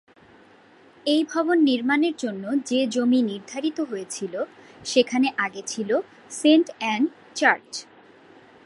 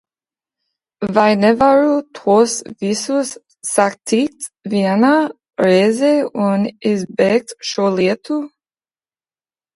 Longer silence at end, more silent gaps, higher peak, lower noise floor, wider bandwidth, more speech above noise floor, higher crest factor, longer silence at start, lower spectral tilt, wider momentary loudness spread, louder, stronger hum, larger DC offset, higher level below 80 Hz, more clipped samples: second, 0.85 s vs 1.3 s; neither; second, -4 dBFS vs 0 dBFS; second, -53 dBFS vs under -90 dBFS; about the same, 11.5 kHz vs 11.5 kHz; second, 30 dB vs over 75 dB; about the same, 20 dB vs 16 dB; about the same, 1.05 s vs 1 s; second, -3.5 dB/octave vs -5 dB/octave; about the same, 11 LU vs 11 LU; second, -23 LUFS vs -16 LUFS; neither; neither; second, -74 dBFS vs -58 dBFS; neither